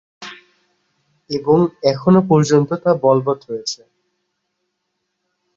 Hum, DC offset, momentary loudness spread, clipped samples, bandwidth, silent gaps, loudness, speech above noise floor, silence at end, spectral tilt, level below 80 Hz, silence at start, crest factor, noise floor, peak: none; under 0.1%; 19 LU; under 0.1%; 7.8 kHz; none; -16 LUFS; 58 dB; 1.8 s; -6.5 dB/octave; -56 dBFS; 0.2 s; 18 dB; -74 dBFS; -2 dBFS